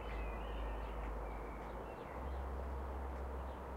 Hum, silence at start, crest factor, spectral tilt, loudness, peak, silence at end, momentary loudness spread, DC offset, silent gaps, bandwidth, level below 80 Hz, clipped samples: none; 0 s; 10 dB; -7.5 dB/octave; -46 LUFS; -34 dBFS; 0 s; 3 LU; under 0.1%; none; 15 kHz; -46 dBFS; under 0.1%